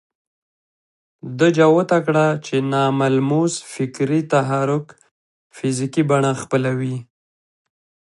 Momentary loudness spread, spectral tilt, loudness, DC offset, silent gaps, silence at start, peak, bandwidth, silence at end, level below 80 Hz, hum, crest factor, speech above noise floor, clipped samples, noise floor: 11 LU; -6 dB/octave; -19 LUFS; under 0.1%; 5.11-5.50 s; 1.25 s; -2 dBFS; 11.5 kHz; 1.15 s; -66 dBFS; none; 18 dB; over 72 dB; under 0.1%; under -90 dBFS